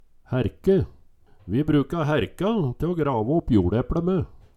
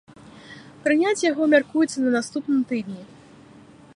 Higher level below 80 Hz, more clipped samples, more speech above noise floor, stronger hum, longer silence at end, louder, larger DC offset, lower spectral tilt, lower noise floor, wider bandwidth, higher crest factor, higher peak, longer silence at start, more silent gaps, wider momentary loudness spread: first, -40 dBFS vs -66 dBFS; neither; about the same, 29 dB vs 27 dB; neither; second, 0.2 s vs 0.9 s; about the same, -24 LUFS vs -22 LUFS; neither; first, -9 dB/octave vs -4 dB/octave; first, -52 dBFS vs -48 dBFS; first, 13 kHz vs 11 kHz; about the same, 16 dB vs 18 dB; about the same, -6 dBFS vs -6 dBFS; about the same, 0.3 s vs 0.25 s; neither; second, 6 LU vs 22 LU